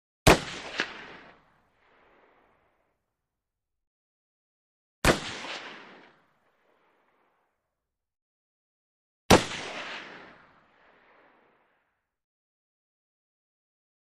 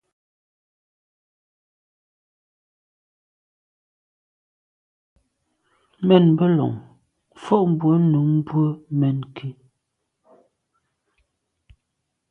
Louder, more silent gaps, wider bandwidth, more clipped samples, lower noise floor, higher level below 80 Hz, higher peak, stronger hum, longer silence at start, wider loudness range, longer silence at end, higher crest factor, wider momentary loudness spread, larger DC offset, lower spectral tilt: second, -26 LUFS vs -19 LUFS; first, 3.87-5.02 s, 8.22-9.29 s vs none; first, 13 kHz vs 4.2 kHz; neither; first, -86 dBFS vs -77 dBFS; first, -46 dBFS vs -64 dBFS; about the same, -2 dBFS vs -2 dBFS; neither; second, 0.25 s vs 6 s; first, 15 LU vs 9 LU; first, 3.75 s vs 2.8 s; first, 32 dB vs 24 dB; first, 25 LU vs 19 LU; neither; second, -4 dB/octave vs -10 dB/octave